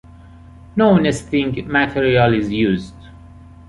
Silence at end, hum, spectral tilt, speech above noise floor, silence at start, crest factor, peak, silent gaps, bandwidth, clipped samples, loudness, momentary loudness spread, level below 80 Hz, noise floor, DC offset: 0.3 s; none; -6.5 dB/octave; 25 dB; 0.75 s; 16 dB; -2 dBFS; none; 11.5 kHz; under 0.1%; -17 LUFS; 9 LU; -40 dBFS; -41 dBFS; under 0.1%